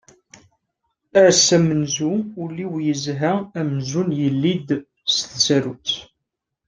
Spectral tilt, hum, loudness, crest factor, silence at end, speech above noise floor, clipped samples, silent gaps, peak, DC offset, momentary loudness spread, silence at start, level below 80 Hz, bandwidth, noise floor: -4 dB/octave; none; -19 LUFS; 20 dB; 0.65 s; 61 dB; under 0.1%; none; -2 dBFS; under 0.1%; 12 LU; 1.15 s; -60 dBFS; 10.5 kHz; -80 dBFS